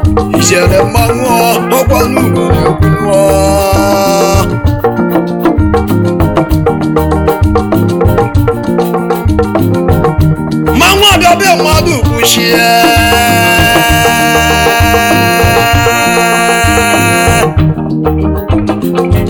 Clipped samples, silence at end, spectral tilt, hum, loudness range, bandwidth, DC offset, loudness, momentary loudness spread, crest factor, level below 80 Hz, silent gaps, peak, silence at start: 2%; 0 s; -4.5 dB/octave; none; 4 LU; over 20 kHz; under 0.1%; -8 LUFS; 5 LU; 8 dB; -20 dBFS; none; 0 dBFS; 0 s